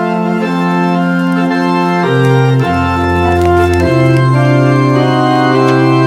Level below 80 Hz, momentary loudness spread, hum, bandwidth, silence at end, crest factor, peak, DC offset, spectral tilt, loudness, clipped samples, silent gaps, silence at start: -34 dBFS; 3 LU; none; 11.5 kHz; 0 s; 10 dB; 0 dBFS; under 0.1%; -7.5 dB/octave; -11 LUFS; under 0.1%; none; 0 s